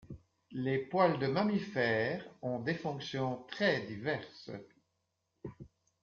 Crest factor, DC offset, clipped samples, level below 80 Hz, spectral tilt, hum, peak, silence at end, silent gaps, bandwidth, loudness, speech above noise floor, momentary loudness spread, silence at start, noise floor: 20 dB; under 0.1%; under 0.1%; -70 dBFS; -4.5 dB/octave; none; -14 dBFS; 0.35 s; none; 7.2 kHz; -34 LUFS; 48 dB; 20 LU; 0.05 s; -83 dBFS